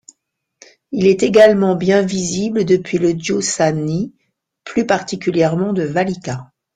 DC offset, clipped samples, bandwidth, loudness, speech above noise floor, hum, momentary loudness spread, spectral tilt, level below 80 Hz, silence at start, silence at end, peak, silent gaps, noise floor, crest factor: under 0.1%; under 0.1%; 9.6 kHz; -16 LUFS; 54 dB; none; 12 LU; -5.5 dB/octave; -54 dBFS; 0.9 s; 0.3 s; 0 dBFS; none; -69 dBFS; 16 dB